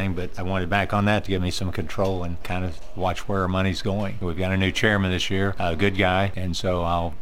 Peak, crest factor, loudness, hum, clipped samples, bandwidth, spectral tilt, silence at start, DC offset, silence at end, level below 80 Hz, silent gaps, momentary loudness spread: -6 dBFS; 18 dB; -24 LUFS; none; under 0.1%; 15 kHz; -5.5 dB/octave; 0 s; 3%; 0 s; -38 dBFS; none; 8 LU